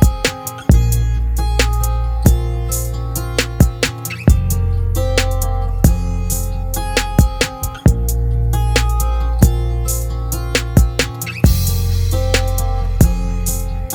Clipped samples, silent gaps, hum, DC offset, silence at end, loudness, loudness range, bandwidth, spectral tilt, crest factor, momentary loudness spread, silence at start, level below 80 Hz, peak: 0.1%; none; none; under 0.1%; 0 s; -17 LUFS; 1 LU; over 20 kHz; -5 dB/octave; 14 dB; 6 LU; 0 s; -18 dBFS; 0 dBFS